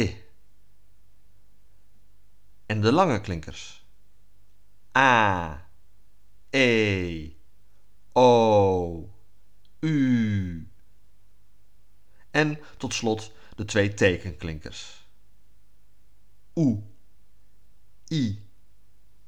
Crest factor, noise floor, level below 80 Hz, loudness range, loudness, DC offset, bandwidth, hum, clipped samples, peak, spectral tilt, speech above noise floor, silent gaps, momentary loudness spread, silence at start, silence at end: 24 dB; -63 dBFS; -54 dBFS; 9 LU; -24 LUFS; 0.8%; 10.5 kHz; 50 Hz at -55 dBFS; under 0.1%; -4 dBFS; -5.5 dB/octave; 40 dB; none; 22 LU; 0 s; 0.85 s